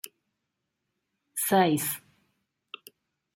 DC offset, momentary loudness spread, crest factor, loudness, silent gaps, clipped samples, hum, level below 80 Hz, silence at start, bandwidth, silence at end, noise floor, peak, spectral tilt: under 0.1%; 23 LU; 22 dB; -26 LUFS; none; under 0.1%; none; -76 dBFS; 0.05 s; 16.5 kHz; 1.4 s; -83 dBFS; -10 dBFS; -4 dB/octave